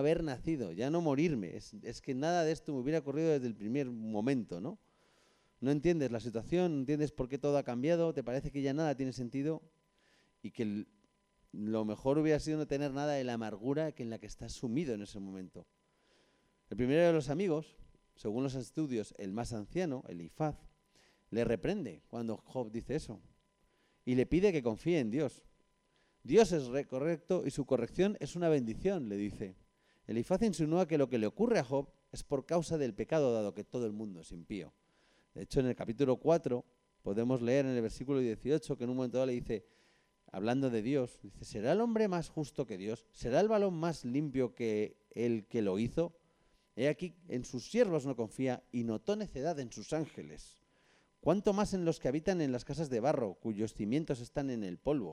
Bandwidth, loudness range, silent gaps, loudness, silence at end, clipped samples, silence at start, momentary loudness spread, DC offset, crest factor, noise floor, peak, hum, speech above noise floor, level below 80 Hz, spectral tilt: 12.5 kHz; 5 LU; none; -35 LUFS; 0 s; under 0.1%; 0 s; 13 LU; under 0.1%; 20 dB; -74 dBFS; -16 dBFS; none; 39 dB; -58 dBFS; -6.5 dB/octave